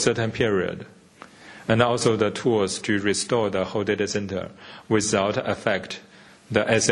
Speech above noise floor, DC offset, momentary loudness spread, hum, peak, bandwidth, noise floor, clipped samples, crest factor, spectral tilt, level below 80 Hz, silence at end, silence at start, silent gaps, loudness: 24 dB; under 0.1%; 14 LU; none; -2 dBFS; 11 kHz; -48 dBFS; under 0.1%; 22 dB; -4 dB/octave; -56 dBFS; 0 s; 0 s; none; -23 LUFS